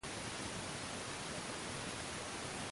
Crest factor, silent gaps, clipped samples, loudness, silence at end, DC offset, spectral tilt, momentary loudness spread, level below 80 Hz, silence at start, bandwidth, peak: 14 dB; none; under 0.1%; -43 LUFS; 0 s; under 0.1%; -2.5 dB/octave; 0 LU; -62 dBFS; 0.05 s; 11.5 kHz; -30 dBFS